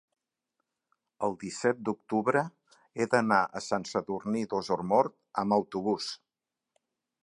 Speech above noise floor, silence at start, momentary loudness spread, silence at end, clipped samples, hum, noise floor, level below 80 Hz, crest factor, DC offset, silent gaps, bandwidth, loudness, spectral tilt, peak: 60 dB; 1.2 s; 8 LU; 1.05 s; under 0.1%; none; -89 dBFS; -70 dBFS; 22 dB; under 0.1%; none; 11.5 kHz; -30 LUFS; -5 dB/octave; -8 dBFS